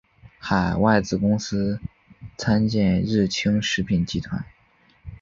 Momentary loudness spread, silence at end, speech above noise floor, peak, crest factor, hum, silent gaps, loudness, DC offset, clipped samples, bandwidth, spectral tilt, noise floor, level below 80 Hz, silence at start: 16 LU; 0.05 s; 37 dB; -4 dBFS; 20 dB; none; none; -22 LUFS; under 0.1%; under 0.1%; 7.6 kHz; -6 dB/octave; -59 dBFS; -44 dBFS; 0.25 s